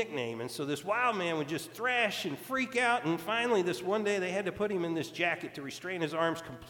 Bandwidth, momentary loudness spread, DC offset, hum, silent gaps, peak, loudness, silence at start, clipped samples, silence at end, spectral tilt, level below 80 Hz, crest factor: 19 kHz; 8 LU; under 0.1%; none; none; -14 dBFS; -32 LUFS; 0 s; under 0.1%; 0 s; -4.5 dB/octave; -70 dBFS; 18 dB